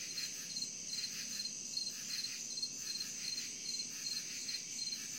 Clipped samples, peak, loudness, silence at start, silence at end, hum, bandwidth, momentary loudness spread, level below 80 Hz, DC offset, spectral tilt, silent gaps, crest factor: under 0.1%; -26 dBFS; -39 LUFS; 0 s; 0 s; none; 16.5 kHz; 1 LU; -86 dBFS; under 0.1%; 1 dB/octave; none; 16 dB